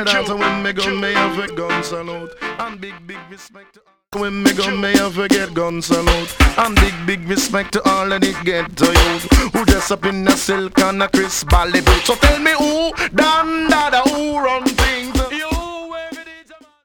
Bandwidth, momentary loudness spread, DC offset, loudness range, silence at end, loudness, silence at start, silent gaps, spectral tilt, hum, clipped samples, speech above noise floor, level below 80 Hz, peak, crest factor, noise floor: 19.5 kHz; 13 LU; under 0.1%; 7 LU; 0.3 s; -16 LUFS; 0 s; none; -4 dB/octave; none; under 0.1%; 28 dB; -24 dBFS; -2 dBFS; 14 dB; -44 dBFS